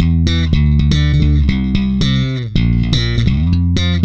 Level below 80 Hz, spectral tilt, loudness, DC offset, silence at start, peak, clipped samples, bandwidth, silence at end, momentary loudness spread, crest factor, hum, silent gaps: -18 dBFS; -6.5 dB/octave; -14 LUFS; under 0.1%; 0 s; -2 dBFS; under 0.1%; 7.6 kHz; 0 s; 3 LU; 12 dB; none; none